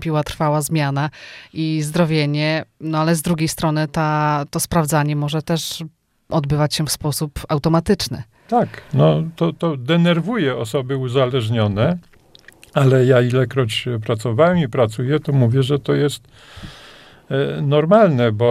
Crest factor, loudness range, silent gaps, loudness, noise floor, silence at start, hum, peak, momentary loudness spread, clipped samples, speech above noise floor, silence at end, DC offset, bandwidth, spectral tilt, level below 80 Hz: 18 dB; 3 LU; none; -18 LUFS; -47 dBFS; 0 s; none; 0 dBFS; 9 LU; under 0.1%; 30 dB; 0 s; under 0.1%; 16 kHz; -6 dB/octave; -46 dBFS